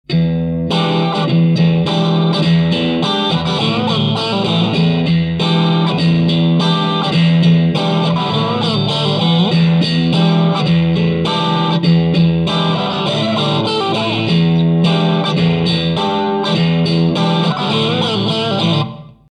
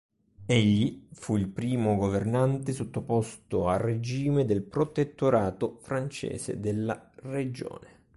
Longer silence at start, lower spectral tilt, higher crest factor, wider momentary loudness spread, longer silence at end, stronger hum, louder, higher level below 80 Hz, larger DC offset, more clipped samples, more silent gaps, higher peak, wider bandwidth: second, 0.1 s vs 0.4 s; about the same, -7 dB/octave vs -7 dB/octave; second, 12 dB vs 18 dB; second, 3 LU vs 10 LU; about the same, 0.25 s vs 0.3 s; neither; first, -14 LUFS vs -29 LUFS; first, -44 dBFS vs -52 dBFS; neither; neither; neither; first, 0 dBFS vs -10 dBFS; second, 9.2 kHz vs 11.5 kHz